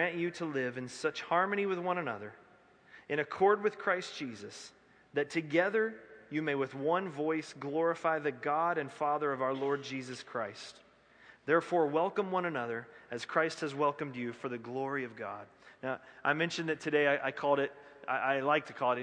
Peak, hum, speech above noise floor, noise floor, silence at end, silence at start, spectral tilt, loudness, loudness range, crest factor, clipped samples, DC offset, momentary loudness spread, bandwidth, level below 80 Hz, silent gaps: -14 dBFS; none; 29 dB; -62 dBFS; 0 s; 0 s; -5.5 dB/octave; -33 LUFS; 3 LU; 20 dB; under 0.1%; under 0.1%; 13 LU; 10 kHz; -80 dBFS; none